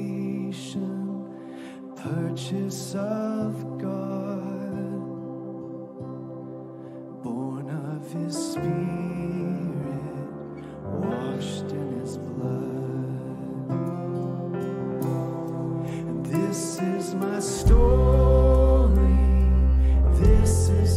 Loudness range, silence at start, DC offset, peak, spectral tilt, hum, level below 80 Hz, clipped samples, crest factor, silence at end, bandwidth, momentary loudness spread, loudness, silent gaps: 13 LU; 0 s; under 0.1%; -8 dBFS; -7 dB/octave; none; -26 dBFS; under 0.1%; 16 dB; 0 s; 13 kHz; 17 LU; -26 LUFS; none